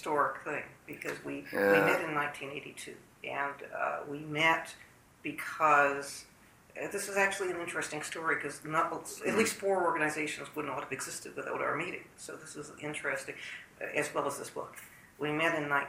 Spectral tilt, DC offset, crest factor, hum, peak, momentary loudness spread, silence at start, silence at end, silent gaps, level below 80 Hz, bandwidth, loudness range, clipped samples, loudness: -3.5 dB/octave; under 0.1%; 24 dB; none; -10 dBFS; 17 LU; 0 s; 0 s; none; -72 dBFS; 16 kHz; 6 LU; under 0.1%; -33 LUFS